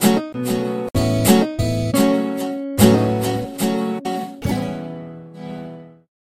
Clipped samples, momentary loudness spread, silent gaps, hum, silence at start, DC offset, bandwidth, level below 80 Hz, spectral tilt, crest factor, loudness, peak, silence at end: under 0.1%; 18 LU; none; none; 0 s; under 0.1%; 16 kHz; -42 dBFS; -5.5 dB/octave; 20 dB; -19 LUFS; 0 dBFS; 0.45 s